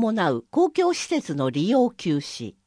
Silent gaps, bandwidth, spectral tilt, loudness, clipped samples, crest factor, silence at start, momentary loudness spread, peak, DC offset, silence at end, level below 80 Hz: none; 10.5 kHz; -5.5 dB/octave; -23 LUFS; under 0.1%; 14 dB; 0 s; 6 LU; -10 dBFS; under 0.1%; 0.15 s; -66 dBFS